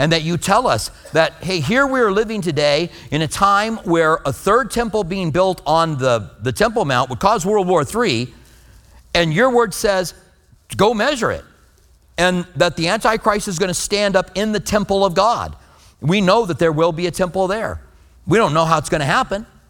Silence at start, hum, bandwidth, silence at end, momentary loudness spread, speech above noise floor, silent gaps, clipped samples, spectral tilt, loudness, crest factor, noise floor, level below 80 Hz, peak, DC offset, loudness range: 0 s; none; 19 kHz; 0.25 s; 7 LU; 34 dB; none; under 0.1%; -4.5 dB/octave; -17 LUFS; 18 dB; -51 dBFS; -42 dBFS; 0 dBFS; under 0.1%; 2 LU